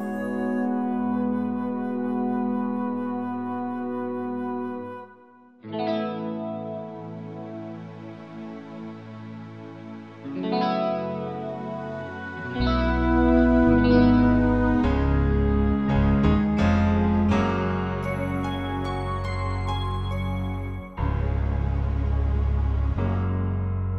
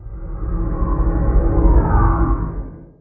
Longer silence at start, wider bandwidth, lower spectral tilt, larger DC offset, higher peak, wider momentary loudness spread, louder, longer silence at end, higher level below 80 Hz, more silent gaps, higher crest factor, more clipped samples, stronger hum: about the same, 0 s vs 0 s; first, 8.4 kHz vs 2.3 kHz; second, -8.5 dB/octave vs -15 dB/octave; first, 0.2% vs under 0.1%; second, -6 dBFS vs -2 dBFS; first, 18 LU vs 15 LU; second, -25 LUFS vs -19 LUFS; second, 0 s vs 0.15 s; second, -32 dBFS vs -18 dBFS; neither; about the same, 18 dB vs 14 dB; neither; neither